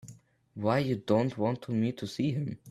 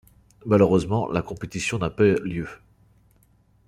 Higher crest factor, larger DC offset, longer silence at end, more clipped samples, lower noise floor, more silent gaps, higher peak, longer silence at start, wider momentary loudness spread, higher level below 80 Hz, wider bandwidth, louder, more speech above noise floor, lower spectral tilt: about the same, 18 dB vs 20 dB; neither; second, 0 s vs 1.15 s; neither; second, -54 dBFS vs -60 dBFS; neither; second, -12 dBFS vs -4 dBFS; second, 0.05 s vs 0.45 s; second, 6 LU vs 14 LU; second, -66 dBFS vs -50 dBFS; about the same, 13.5 kHz vs 13 kHz; second, -31 LUFS vs -23 LUFS; second, 25 dB vs 38 dB; about the same, -7.5 dB/octave vs -6.5 dB/octave